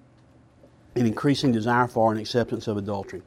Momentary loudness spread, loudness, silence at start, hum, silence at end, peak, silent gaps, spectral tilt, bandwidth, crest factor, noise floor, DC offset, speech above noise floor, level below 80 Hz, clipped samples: 7 LU; -24 LUFS; 0.95 s; none; 0.05 s; -6 dBFS; none; -6.5 dB/octave; 14 kHz; 20 dB; -55 dBFS; under 0.1%; 32 dB; -58 dBFS; under 0.1%